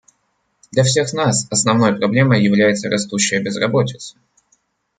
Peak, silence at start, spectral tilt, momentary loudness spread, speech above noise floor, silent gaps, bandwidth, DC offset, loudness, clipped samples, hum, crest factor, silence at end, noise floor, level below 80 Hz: -2 dBFS; 0.75 s; -4.5 dB/octave; 7 LU; 51 dB; none; 9.6 kHz; under 0.1%; -16 LUFS; under 0.1%; none; 16 dB; 0.9 s; -67 dBFS; -58 dBFS